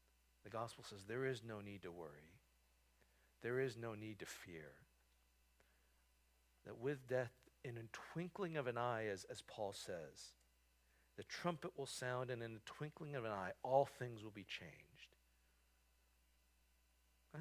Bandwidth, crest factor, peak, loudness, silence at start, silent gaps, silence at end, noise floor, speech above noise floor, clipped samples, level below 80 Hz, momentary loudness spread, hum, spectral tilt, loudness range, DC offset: 16 kHz; 26 dB; -22 dBFS; -47 LUFS; 0.45 s; none; 0 s; -77 dBFS; 30 dB; under 0.1%; -78 dBFS; 16 LU; none; -5 dB/octave; 6 LU; under 0.1%